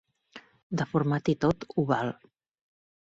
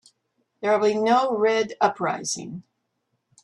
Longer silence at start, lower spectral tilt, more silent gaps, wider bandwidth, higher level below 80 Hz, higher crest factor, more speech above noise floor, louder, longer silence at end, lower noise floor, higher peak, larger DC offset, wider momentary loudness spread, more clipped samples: second, 0.35 s vs 0.6 s; first, -7.5 dB/octave vs -3.5 dB/octave; first, 0.63-0.70 s vs none; second, 7.8 kHz vs 11.5 kHz; first, -60 dBFS vs -72 dBFS; about the same, 20 dB vs 18 dB; second, 25 dB vs 53 dB; second, -29 LUFS vs -23 LUFS; about the same, 0.95 s vs 0.85 s; second, -53 dBFS vs -75 dBFS; second, -12 dBFS vs -6 dBFS; neither; about the same, 9 LU vs 11 LU; neither